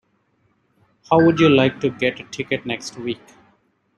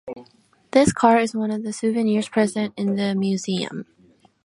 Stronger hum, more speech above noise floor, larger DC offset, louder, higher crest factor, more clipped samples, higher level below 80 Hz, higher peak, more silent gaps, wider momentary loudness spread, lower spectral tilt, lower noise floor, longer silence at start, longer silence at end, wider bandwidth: neither; first, 46 dB vs 37 dB; neither; about the same, -19 LUFS vs -21 LUFS; about the same, 20 dB vs 20 dB; neither; about the same, -58 dBFS vs -54 dBFS; about the same, -2 dBFS vs -2 dBFS; neither; first, 16 LU vs 12 LU; about the same, -6 dB/octave vs -5.5 dB/octave; first, -64 dBFS vs -57 dBFS; first, 1.1 s vs 0.05 s; first, 0.85 s vs 0.6 s; second, 9.4 kHz vs 11.5 kHz